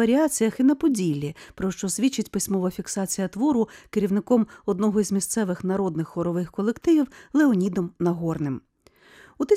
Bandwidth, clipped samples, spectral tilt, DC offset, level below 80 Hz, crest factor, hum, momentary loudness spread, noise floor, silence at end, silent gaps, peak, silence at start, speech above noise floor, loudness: 16 kHz; under 0.1%; -5.5 dB/octave; under 0.1%; -56 dBFS; 16 dB; none; 8 LU; -55 dBFS; 0 s; none; -8 dBFS; 0 s; 32 dB; -24 LUFS